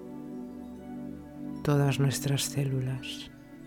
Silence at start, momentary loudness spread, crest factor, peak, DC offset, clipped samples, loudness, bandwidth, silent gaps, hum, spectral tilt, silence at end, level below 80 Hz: 0 s; 16 LU; 16 dB; -14 dBFS; under 0.1%; under 0.1%; -31 LUFS; 18 kHz; none; none; -5.5 dB/octave; 0 s; -56 dBFS